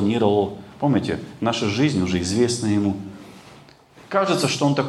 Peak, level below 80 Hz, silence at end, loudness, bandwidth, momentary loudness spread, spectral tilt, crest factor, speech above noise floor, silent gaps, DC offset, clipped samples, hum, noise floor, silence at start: -4 dBFS; -58 dBFS; 0 s; -22 LUFS; 12.5 kHz; 8 LU; -5.5 dB/octave; 18 dB; 27 dB; none; under 0.1%; under 0.1%; none; -48 dBFS; 0 s